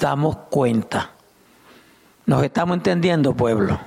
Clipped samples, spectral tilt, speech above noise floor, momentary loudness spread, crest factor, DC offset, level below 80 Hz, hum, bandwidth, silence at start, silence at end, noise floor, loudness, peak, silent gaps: under 0.1%; -7 dB/octave; 34 dB; 8 LU; 14 dB; under 0.1%; -48 dBFS; none; 15 kHz; 0 s; 0 s; -53 dBFS; -20 LUFS; -8 dBFS; none